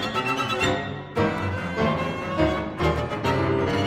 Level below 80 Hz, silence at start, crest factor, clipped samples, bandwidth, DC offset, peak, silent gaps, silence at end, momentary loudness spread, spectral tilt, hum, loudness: -40 dBFS; 0 s; 16 dB; under 0.1%; 15.5 kHz; under 0.1%; -8 dBFS; none; 0 s; 5 LU; -6 dB/octave; none; -25 LUFS